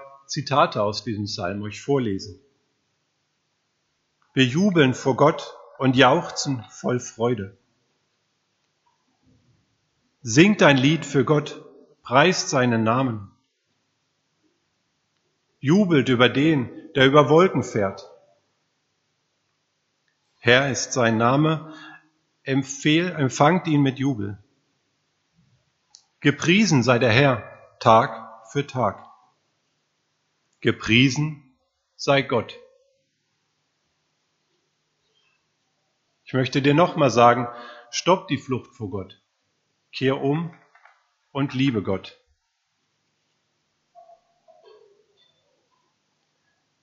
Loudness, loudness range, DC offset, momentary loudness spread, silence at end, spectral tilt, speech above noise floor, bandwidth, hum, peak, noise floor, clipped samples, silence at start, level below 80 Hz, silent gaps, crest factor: -21 LUFS; 10 LU; under 0.1%; 16 LU; 4.75 s; -4.5 dB/octave; 53 dB; 8 kHz; none; 0 dBFS; -73 dBFS; under 0.1%; 0 s; -60 dBFS; none; 24 dB